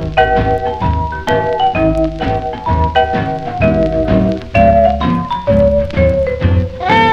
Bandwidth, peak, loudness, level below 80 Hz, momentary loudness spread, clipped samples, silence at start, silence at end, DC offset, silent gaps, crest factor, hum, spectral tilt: 8.2 kHz; 0 dBFS; -13 LUFS; -24 dBFS; 6 LU; under 0.1%; 0 s; 0 s; under 0.1%; none; 12 dB; none; -8 dB/octave